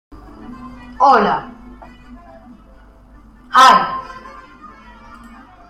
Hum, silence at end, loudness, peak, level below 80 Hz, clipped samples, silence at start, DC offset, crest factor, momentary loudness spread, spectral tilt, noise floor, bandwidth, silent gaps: none; 1.4 s; -13 LUFS; 0 dBFS; -46 dBFS; under 0.1%; 0.45 s; under 0.1%; 18 dB; 27 LU; -3 dB/octave; -44 dBFS; 16 kHz; none